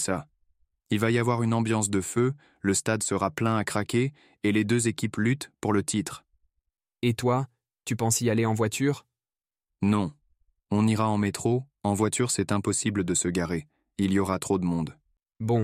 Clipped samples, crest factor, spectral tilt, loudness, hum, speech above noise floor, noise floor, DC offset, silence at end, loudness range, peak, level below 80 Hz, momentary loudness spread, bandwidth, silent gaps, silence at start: under 0.1%; 18 dB; -5 dB/octave; -27 LUFS; none; over 64 dB; under -90 dBFS; under 0.1%; 0 s; 2 LU; -10 dBFS; -62 dBFS; 8 LU; 16 kHz; none; 0 s